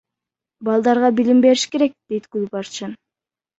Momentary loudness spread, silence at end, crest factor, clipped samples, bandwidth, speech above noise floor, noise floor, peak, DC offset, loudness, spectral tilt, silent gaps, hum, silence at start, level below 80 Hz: 15 LU; 0.65 s; 16 dB; under 0.1%; 8 kHz; 70 dB; -88 dBFS; -4 dBFS; under 0.1%; -18 LUFS; -4.5 dB/octave; none; none; 0.6 s; -64 dBFS